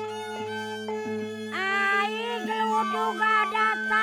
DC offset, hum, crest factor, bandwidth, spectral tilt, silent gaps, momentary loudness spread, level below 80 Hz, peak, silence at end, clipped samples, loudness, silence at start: under 0.1%; none; 14 dB; 18 kHz; -3.5 dB/octave; none; 10 LU; -74 dBFS; -12 dBFS; 0 s; under 0.1%; -26 LUFS; 0 s